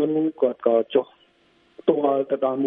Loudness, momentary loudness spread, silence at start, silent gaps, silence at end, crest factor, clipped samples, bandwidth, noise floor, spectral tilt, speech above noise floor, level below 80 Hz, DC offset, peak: -22 LUFS; 5 LU; 0 s; none; 0 s; 20 dB; under 0.1%; 3.8 kHz; -60 dBFS; -10 dB/octave; 39 dB; -74 dBFS; under 0.1%; -4 dBFS